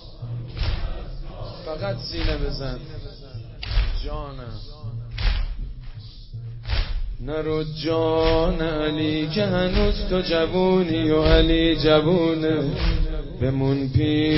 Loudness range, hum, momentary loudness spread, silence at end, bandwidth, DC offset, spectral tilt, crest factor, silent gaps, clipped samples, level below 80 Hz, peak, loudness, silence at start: 11 LU; none; 19 LU; 0 s; 5.8 kHz; under 0.1%; -10.5 dB/octave; 18 dB; none; under 0.1%; -28 dBFS; -4 dBFS; -23 LUFS; 0 s